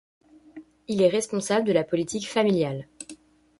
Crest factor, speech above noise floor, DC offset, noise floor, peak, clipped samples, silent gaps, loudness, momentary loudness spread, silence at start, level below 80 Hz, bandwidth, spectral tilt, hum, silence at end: 18 dB; 25 dB; under 0.1%; -49 dBFS; -8 dBFS; under 0.1%; none; -24 LUFS; 19 LU; 0.55 s; -64 dBFS; 11.5 kHz; -5 dB/octave; none; 0.45 s